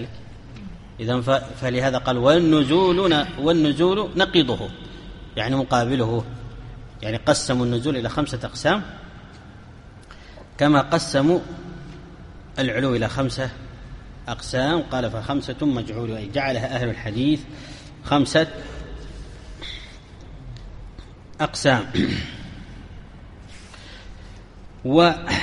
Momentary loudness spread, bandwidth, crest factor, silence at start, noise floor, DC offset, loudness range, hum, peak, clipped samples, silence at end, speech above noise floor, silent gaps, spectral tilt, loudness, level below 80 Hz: 24 LU; 11.5 kHz; 20 dB; 0 s; -43 dBFS; under 0.1%; 8 LU; none; -4 dBFS; under 0.1%; 0 s; 22 dB; none; -5.5 dB/octave; -21 LUFS; -42 dBFS